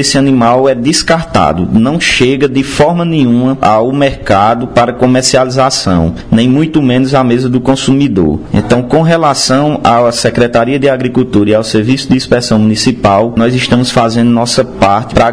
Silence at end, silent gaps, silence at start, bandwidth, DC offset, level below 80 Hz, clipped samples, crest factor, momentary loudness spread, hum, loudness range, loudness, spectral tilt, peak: 0 s; none; 0 s; 10.5 kHz; 0.9%; -32 dBFS; 1%; 8 dB; 3 LU; none; 1 LU; -9 LUFS; -5 dB/octave; 0 dBFS